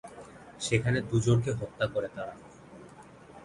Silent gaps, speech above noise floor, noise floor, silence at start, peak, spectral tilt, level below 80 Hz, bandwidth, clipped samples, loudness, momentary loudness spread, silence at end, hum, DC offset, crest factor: none; 22 dB; -51 dBFS; 0.05 s; -10 dBFS; -6 dB/octave; -54 dBFS; 11.5 kHz; under 0.1%; -30 LUFS; 24 LU; 0 s; none; under 0.1%; 22 dB